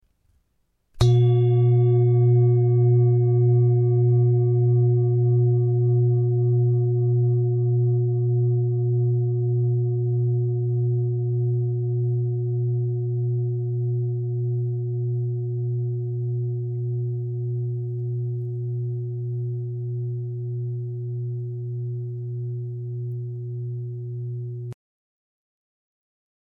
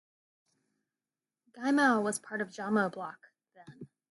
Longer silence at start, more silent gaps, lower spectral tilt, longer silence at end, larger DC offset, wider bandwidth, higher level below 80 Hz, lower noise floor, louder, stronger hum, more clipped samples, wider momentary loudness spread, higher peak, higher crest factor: second, 0.95 s vs 1.55 s; neither; first, -10.5 dB/octave vs -4.5 dB/octave; first, 1.75 s vs 0.25 s; neither; second, 4.5 kHz vs 12 kHz; first, -52 dBFS vs -84 dBFS; second, -70 dBFS vs under -90 dBFS; first, -23 LUFS vs -30 LUFS; neither; neither; second, 12 LU vs 19 LU; first, -6 dBFS vs -14 dBFS; about the same, 16 dB vs 20 dB